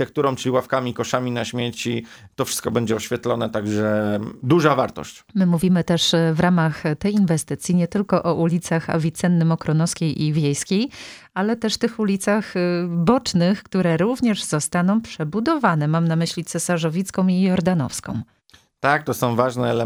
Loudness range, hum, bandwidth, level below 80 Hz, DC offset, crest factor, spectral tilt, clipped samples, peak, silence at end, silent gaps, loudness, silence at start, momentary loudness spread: 3 LU; none; 19 kHz; -54 dBFS; under 0.1%; 18 dB; -5.5 dB/octave; under 0.1%; -2 dBFS; 0 s; none; -21 LUFS; 0 s; 7 LU